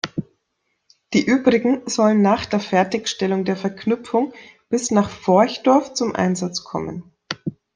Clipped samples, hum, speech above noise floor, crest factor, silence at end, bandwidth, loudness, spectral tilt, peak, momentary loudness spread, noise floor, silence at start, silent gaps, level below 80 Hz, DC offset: under 0.1%; none; 54 dB; 18 dB; 0.25 s; 10 kHz; -20 LUFS; -5 dB/octave; -2 dBFS; 13 LU; -73 dBFS; 0.05 s; none; -58 dBFS; under 0.1%